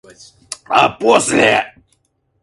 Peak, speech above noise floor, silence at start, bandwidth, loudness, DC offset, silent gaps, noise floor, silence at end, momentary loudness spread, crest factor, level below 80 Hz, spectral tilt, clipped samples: 0 dBFS; 50 dB; 0.5 s; 11.5 kHz; -13 LUFS; under 0.1%; none; -63 dBFS; 0.75 s; 19 LU; 16 dB; -54 dBFS; -3 dB/octave; under 0.1%